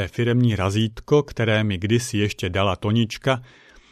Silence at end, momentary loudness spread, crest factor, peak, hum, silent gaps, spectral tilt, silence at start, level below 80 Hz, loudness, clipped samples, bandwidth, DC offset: 0.45 s; 4 LU; 18 dB; -4 dBFS; none; none; -6 dB/octave; 0 s; -48 dBFS; -22 LUFS; under 0.1%; 13.5 kHz; under 0.1%